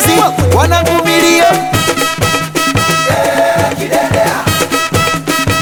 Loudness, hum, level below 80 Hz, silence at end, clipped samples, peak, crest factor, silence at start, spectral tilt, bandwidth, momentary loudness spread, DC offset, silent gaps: -11 LUFS; none; -36 dBFS; 0 s; under 0.1%; 0 dBFS; 10 dB; 0 s; -4 dB/octave; over 20 kHz; 4 LU; under 0.1%; none